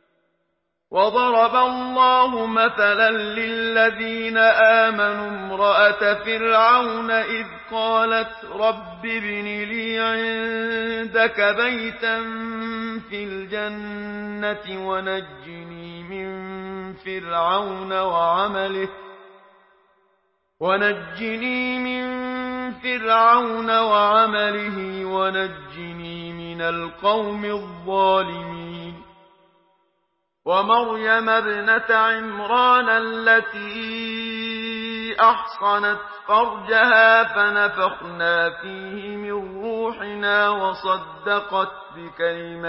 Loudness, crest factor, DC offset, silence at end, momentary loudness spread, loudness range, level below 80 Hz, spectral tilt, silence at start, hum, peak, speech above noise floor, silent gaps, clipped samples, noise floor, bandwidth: -20 LUFS; 18 dB; under 0.1%; 0 s; 15 LU; 9 LU; -58 dBFS; -8.5 dB/octave; 0.9 s; none; -2 dBFS; 53 dB; none; under 0.1%; -74 dBFS; 5.8 kHz